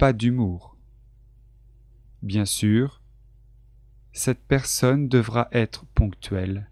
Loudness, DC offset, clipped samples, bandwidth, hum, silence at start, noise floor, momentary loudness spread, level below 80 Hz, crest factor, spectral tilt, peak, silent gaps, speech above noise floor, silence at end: -23 LUFS; under 0.1%; under 0.1%; 15 kHz; 50 Hz at -50 dBFS; 0 s; -52 dBFS; 9 LU; -36 dBFS; 20 dB; -5.5 dB/octave; -4 dBFS; none; 30 dB; 0.05 s